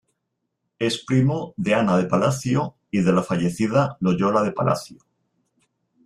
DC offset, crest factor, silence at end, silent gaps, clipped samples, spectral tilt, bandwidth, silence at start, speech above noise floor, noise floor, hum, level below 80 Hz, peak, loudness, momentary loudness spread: under 0.1%; 16 dB; 1.1 s; none; under 0.1%; -6.5 dB/octave; 13 kHz; 0.8 s; 57 dB; -78 dBFS; none; -56 dBFS; -6 dBFS; -22 LUFS; 6 LU